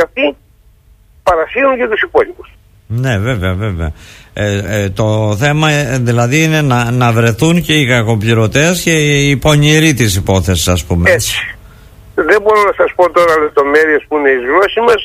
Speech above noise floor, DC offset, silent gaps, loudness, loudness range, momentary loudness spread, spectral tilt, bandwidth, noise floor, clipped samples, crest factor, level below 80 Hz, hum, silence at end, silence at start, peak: 34 dB; under 0.1%; none; -11 LUFS; 5 LU; 7 LU; -5 dB/octave; 15.5 kHz; -45 dBFS; under 0.1%; 12 dB; -32 dBFS; none; 0 s; 0 s; 0 dBFS